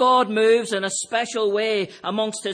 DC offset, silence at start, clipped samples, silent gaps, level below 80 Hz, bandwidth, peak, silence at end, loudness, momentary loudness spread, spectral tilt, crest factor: under 0.1%; 0 s; under 0.1%; none; -78 dBFS; 10.5 kHz; -8 dBFS; 0 s; -21 LUFS; 7 LU; -3 dB/octave; 14 dB